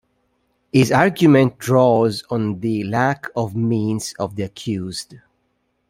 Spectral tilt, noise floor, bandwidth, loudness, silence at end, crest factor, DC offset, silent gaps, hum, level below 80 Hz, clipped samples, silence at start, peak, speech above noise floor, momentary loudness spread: -6.5 dB/octave; -68 dBFS; 16 kHz; -18 LUFS; 0.75 s; 18 dB; under 0.1%; none; none; -56 dBFS; under 0.1%; 0.75 s; -2 dBFS; 50 dB; 12 LU